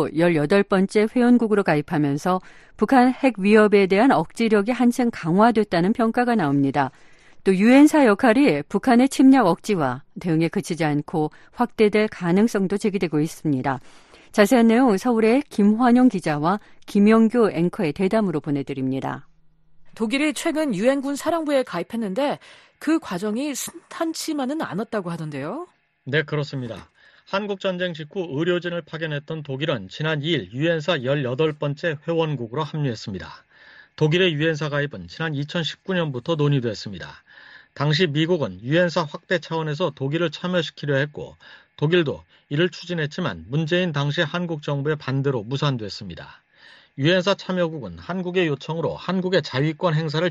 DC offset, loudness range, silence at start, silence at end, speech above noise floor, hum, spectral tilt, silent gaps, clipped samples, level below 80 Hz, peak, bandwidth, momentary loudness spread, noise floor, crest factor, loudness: under 0.1%; 8 LU; 0 s; 0 s; 30 dB; none; -6 dB/octave; none; under 0.1%; -58 dBFS; -2 dBFS; 13 kHz; 12 LU; -51 dBFS; 18 dB; -21 LUFS